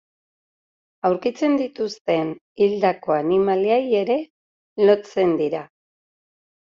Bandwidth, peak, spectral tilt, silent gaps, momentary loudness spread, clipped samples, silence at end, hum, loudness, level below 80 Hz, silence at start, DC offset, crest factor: 7.4 kHz; -4 dBFS; -5 dB/octave; 2.01-2.05 s, 2.41-2.56 s, 4.30-4.76 s; 9 LU; under 0.1%; 0.95 s; none; -21 LUFS; -66 dBFS; 1.05 s; under 0.1%; 18 dB